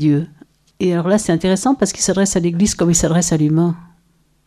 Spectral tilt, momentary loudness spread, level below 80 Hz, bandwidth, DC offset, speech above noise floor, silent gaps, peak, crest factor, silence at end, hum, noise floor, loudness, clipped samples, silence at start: -5 dB/octave; 6 LU; -40 dBFS; 14.5 kHz; under 0.1%; 43 dB; none; -2 dBFS; 16 dB; 0.6 s; none; -58 dBFS; -16 LUFS; under 0.1%; 0 s